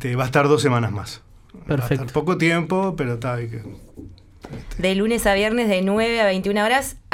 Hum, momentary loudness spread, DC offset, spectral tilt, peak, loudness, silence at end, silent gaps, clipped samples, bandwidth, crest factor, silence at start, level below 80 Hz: none; 17 LU; under 0.1%; -5.5 dB/octave; -2 dBFS; -20 LUFS; 0.15 s; none; under 0.1%; 16.5 kHz; 18 dB; 0 s; -42 dBFS